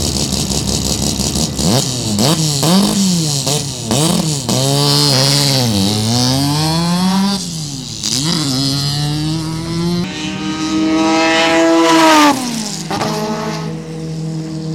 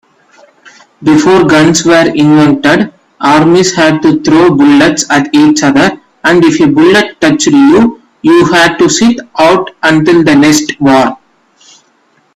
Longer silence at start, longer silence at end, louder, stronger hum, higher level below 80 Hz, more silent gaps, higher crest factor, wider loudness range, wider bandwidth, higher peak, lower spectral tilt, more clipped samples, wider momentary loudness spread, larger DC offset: second, 0 s vs 1 s; second, 0 s vs 1.2 s; second, -14 LUFS vs -7 LUFS; neither; first, -36 dBFS vs -44 dBFS; neither; first, 14 dB vs 6 dB; first, 4 LU vs 1 LU; first, 18 kHz vs 13.5 kHz; about the same, 0 dBFS vs 0 dBFS; about the same, -4 dB/octave vs -4.5 dB/octave; second, under 0.1% vs 0.3%; first, 10 LU vs 5 LU; neither